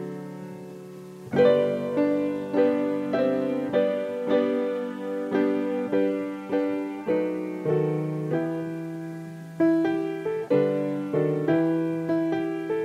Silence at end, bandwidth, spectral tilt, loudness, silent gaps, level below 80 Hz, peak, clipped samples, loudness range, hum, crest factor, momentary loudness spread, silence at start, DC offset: 0 s; 13 kHz; -8 dB/octave; -26 LUFS; none; -70 dBFS; -8 dBFS; under 0.1%; 3 LU; none; 16 dB; 13 LU; 0 s; under 0.1%